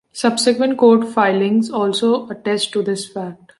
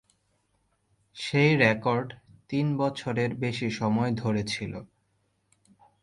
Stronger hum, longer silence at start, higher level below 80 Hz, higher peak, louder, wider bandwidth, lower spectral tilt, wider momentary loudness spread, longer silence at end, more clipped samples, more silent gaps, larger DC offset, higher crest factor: neither; second, 0.15 s vs 1.15 s; second, -66 dBFS vs -60 dBFS; first, -2 dBFS vs -6 dBFS; first, -17 LUFS vs -27 LUFS; about the same, 11.5 kHz vs 11.5 kHz; second, -4.5 dB/octave vs -6.5 dB/octave; about the same, 10 LU vs 12 LU; second, 0.25 s vs 1.15 s; neither; neither; neither; second, 14 dB vs 24 dB